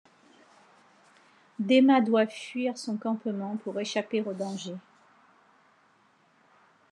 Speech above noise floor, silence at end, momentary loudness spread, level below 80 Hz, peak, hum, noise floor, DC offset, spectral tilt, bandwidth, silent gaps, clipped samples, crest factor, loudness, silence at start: 38 dB; 2.15 s; 16 LU; under -90 dBFS; -10 dBFS; none; -64 dBFS; under 0.1%; -5.5 dB/octave; 10.5 kHz; none; under 0.1%; 20 dB; -27 LUFS; 1.6 s